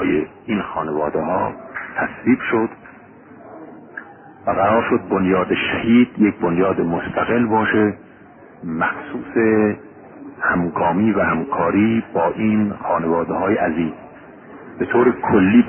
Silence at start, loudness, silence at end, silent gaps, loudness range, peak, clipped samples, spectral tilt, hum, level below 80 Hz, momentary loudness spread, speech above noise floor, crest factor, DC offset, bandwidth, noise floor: 0 s; -19 LUFS; 0 s; none; 5 LU; -2 dBFS; under 0.1%; -12 dB/octave; none; -48 dBFS; 16 LU; 26 dB; 18 dB; under 0.1%; 3.4 kHz; -44 dBFS